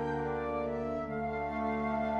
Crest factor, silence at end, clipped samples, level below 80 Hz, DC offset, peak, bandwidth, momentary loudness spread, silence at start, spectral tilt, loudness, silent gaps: 12 dB; 0 s; under 0.1%; -52 dBFS; under 0.1%; -22 dBFS; 7.6 kHz; 3 LU; 0 s; -8.5 dB/octave; -35 LUFS; none